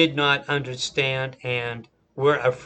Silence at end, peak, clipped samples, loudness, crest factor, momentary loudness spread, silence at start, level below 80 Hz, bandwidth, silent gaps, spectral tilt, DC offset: 0 s; -4 dBFS; under 0.1%; -23 LUFS; 20 dB; 11 LU; 0 s; -60 dBFS; 8.8 kHz; none; -4.5 dB/octave; under 0.1%